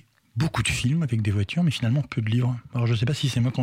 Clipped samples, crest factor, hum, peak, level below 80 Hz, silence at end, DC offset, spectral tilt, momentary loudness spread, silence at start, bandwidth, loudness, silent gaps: under 0.1%; 10 dB; none; -14 dBFS; -48 dBFS; 0 s; under 0.1%; -5.5 dB/octave; 4 LU; 0.35 s; 13.5 kHz; -25 LUFS; none